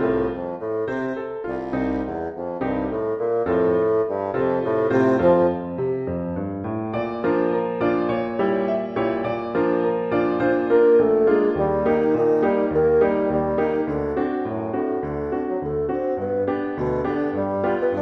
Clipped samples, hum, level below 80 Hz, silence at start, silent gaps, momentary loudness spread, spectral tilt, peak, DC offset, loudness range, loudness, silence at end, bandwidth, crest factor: under 0.1%; none; -46 dBFS; 0 s; none; 9 LU; -9.5 dB/octave; -6 dBFS; under 0.1%; 6 LU; -22 LUFS; 0 s; 5.8 kHz; 16 dB